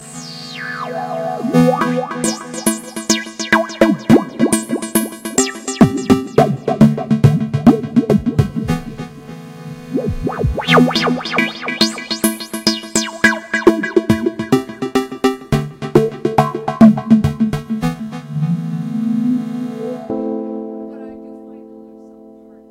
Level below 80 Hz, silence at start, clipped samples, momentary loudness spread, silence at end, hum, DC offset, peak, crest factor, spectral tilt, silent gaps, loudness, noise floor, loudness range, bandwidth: -38 dBFS; 0 s; under 0.1%; 14 LU; 0.4 s; none; under 0.1%; 0 dBFS; 16 dB; -5 dB/octave; none; -16 LUFS; -40 dBFS; 7 LU; 16 kHz